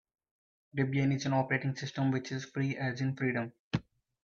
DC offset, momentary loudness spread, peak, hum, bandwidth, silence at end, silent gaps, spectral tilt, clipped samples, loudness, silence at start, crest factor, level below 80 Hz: under 0.1%; 8 LU; -14 dBFS; none; 7.2 kHz; 0.4 s; 3.59-3.71 s; -6.5 dB/octave; under 0.1%; -33 LUFS; 0.75 s; 20 dB; -66 dBFS